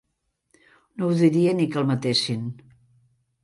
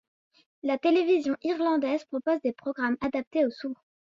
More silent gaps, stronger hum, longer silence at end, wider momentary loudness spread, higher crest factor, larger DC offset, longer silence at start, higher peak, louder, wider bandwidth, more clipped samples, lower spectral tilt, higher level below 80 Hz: second, none vs 3.27-3.31 s; neither; first, 0.9 s vs 0.4 s; first, 13 LU vs 10 LU; about the same, 18 dB vs 14 dB; neither; first, 1 s vs 0.65 s; first, -8 dBFS vs -12 dBFS; first, -22 LUFS vs -28 LUFS; first, 11.5 kHz vs 7.4 kHz; neither; about the same, -6 dB/octave vs -5.5 dB/octave; about the same, -66 dBFS vs -66 dBFS